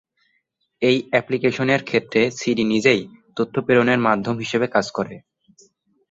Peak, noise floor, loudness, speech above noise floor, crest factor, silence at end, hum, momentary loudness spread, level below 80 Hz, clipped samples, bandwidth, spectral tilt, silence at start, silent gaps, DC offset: -2 dBFS; -70 dBFS; -20 LUFS; 50 dB; 18 dB; 0.95 s; none; 9 LU; -60 dBFS; under 0.1%; 8 kHz; -5.5 dB/octave; 0.8 s; none; under 0.1%